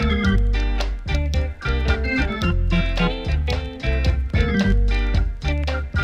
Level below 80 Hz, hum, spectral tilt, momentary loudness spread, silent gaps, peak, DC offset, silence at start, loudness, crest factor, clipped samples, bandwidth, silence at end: -22 dBFS; none; -6.5 dB/octave; 5 LU; none; -6 dBFS; under 0.1%; 0 s; -22 LUFS; 14 dB; under 0.1%; 8.2 kHz; 0 s